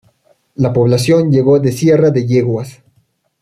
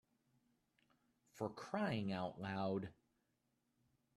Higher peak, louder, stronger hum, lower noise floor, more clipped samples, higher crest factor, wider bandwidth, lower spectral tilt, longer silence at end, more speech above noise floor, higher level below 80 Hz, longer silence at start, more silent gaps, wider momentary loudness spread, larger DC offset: first, -2 dBFS vs -26 dBFS; first, -12 LUFS vs -44 LUFS; neither; second, -59 dBFS vs -85 dBFS; neither; second, 12 dB vs 20 dB; first, 14 kHz vs 12.5 kHz; about the same, -7.5 dB/octave vs -7 dB/octave; second, 0.7 s vs 1.25 s; first, 47 dB vs 42 dB; first, -50 dBFS vs -80 dBFS; second, 0.6 s vs 1.35 s; neither; first, 10 LU vs 7 LU; neither